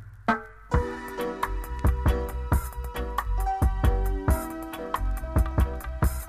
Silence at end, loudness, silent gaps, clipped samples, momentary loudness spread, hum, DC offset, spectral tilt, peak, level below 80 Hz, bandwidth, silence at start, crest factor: 0 s; -29 LUFS; none; under 0.1%; 7 LU; none; under 0.1%; -6.5 dB/octave; -10 dBFS; -28 dBFS; 15.5 kHz; 0 s; 16 dB